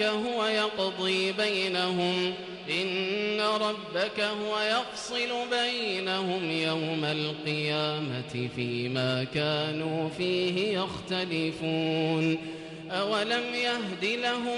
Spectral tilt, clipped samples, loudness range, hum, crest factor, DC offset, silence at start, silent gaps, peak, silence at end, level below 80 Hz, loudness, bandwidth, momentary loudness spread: -4.5 dB/octave; under 0.1%; 2 LU; none; 14 dB; under 0.1%; 0 s; none; -16 dBFS; 0 s; -66 dBFS; -29 LUFS; 11.5 kHz; 5 LU